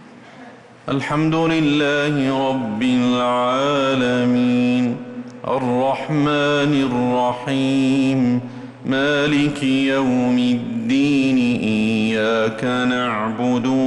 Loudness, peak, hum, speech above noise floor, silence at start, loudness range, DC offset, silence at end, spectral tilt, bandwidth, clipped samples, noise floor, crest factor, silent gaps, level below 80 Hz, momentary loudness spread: -18 LUFS; -8 dBFS; none; 23 dB; 0 s; 1 LU; under 0.1%; 0 s; -6 dB/octave; 11 kHz; under 0.1%; -41 dBFS; 10 dB; none; -54 dBFS; 5 LU